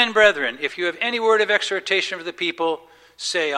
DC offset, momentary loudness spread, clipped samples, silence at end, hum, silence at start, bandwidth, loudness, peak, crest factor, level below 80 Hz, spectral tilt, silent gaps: under 0.1%; 9 LU; under 0.1%; 0 s; none; 0 s; 12 kHz; -20 LUFS; -2 dBFS; 20 dB; -62 dBFS; -1.5 dB/octave; none